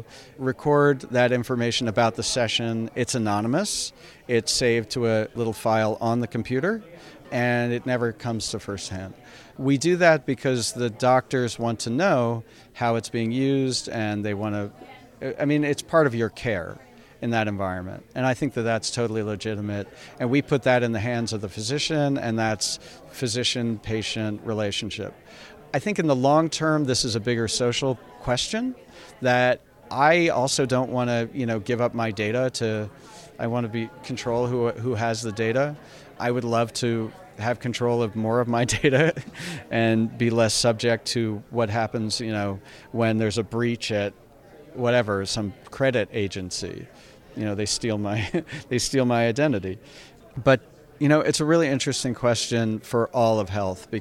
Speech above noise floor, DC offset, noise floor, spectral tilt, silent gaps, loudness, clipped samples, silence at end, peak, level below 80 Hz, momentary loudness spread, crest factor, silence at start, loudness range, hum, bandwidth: 24 dB; under 0.1%; -48 dBFS; -5 dB/octave; none; -24 LUFS; under 0.1%; 0 s; -6 dBFS; -54 dBFS; 11 LU; 20 dB; 0 s; 4 LU; none; 15.5 kHz